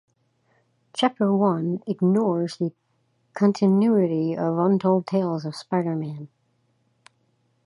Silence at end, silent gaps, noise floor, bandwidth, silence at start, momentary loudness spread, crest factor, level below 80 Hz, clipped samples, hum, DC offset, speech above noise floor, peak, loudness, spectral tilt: 1.4 s; none; -68 dBFS; 11 kHz; 0.95 s; 11 LU; 18 dB; -72 dBFS; under 0.1%; none; under 0.1%; 46 dB; -6 dBFS; -23 LUFS; -8 dB/octave